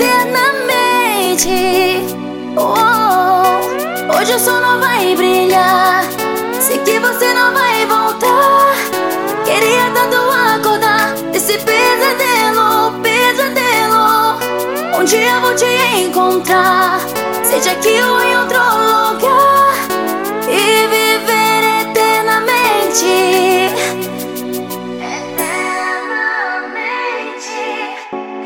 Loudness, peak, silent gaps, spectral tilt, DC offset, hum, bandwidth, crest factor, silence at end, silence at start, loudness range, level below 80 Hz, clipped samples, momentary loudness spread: -12 LUFS; 0 dBFS; none; -2 dB/octave; 0.2%; none; 17 kHz; 12 dB; 0 s; 0 s; 4 LU; -54 dBFS; under 0.1%; 9 LU